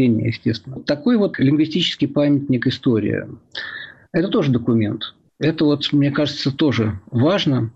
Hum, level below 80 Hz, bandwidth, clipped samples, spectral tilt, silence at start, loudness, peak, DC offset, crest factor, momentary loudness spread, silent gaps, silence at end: none; -54 dBFS; 7.8 kHz; under 0.1%; -7 dB/octave; 0 s; -19 LUFS; -8 dBFS; under 0.1%; 12 dB; 11 LU; none; 0.05 s